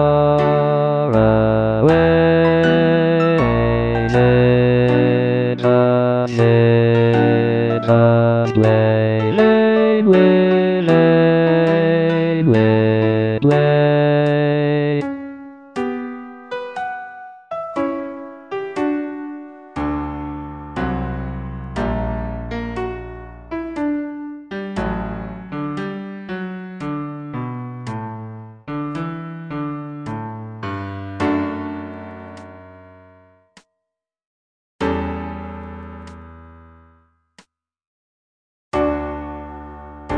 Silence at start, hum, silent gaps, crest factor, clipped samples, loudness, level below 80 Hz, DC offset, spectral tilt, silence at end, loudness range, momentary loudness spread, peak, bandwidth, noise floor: 0 s; none; 34.27-34.79 s, 37.87-38.72 s; 16 dB; under 0.1%; -17 LUFS; -38 dBFS; under 0.1%; -9 dB/octave; 0 s; 16 LU; 18 LU; -2 dBFS; 8.4 kHz; -81 dBFS